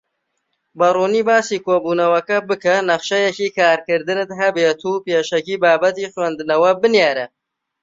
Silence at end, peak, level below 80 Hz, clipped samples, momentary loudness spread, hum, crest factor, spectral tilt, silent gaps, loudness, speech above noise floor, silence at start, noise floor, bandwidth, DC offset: 0.55 s; -2 dBFS; -66 dBFS; under 0.1%; 7 LU; none; 16 dB; -4 dB/octave; none; -17 LUFS; 56 dB; 0.75 s; -72 dBFS; 7.8 kHz; under 0.1%